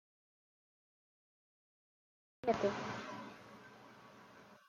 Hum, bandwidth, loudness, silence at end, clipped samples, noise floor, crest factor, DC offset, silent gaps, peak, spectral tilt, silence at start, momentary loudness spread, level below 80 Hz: none; 14 kHz; -40 LUFS; 0.1 s; under 0.1%; -60 dBFS; 24 dB; under 0.1%; none; -22 dBFS; -5.5 dB/octave; 2.45 s; 23 LU; -78 dBFS